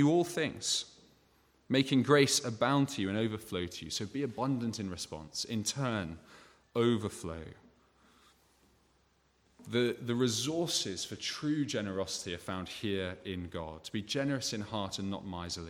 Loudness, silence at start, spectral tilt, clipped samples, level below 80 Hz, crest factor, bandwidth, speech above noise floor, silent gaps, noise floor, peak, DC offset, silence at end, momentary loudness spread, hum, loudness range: -33 LUFS; 0 s; -4 dB/octave; under 0.1%; -64 dBFS; 22 dB; 17 kHz; 37 dB; none; -71 dBFS; -12 dBFS; under 0.1%; 0 s; 11 LU; none; 8 LU